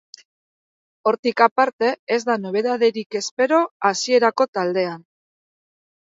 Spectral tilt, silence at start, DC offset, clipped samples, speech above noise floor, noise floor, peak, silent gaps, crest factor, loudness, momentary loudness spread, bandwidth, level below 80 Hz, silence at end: -3.5 dB/octave; 1.05 s; under 0.1%; under 0.1%; over 71 dB; under -90 dBFS; -2 dBFS; 1.19-1.23 s, 1.51-1.56 s, 1.73-1.79 s, 1.99-2.07 s, 3.06-3.10 s, 3.31-3.37 s, 3.71-3.80 s, 4.48-4.53 s; 20 dB; -20 LUFS; 8 LU; 7.8 kHz; -76 dBFS; 1.05 s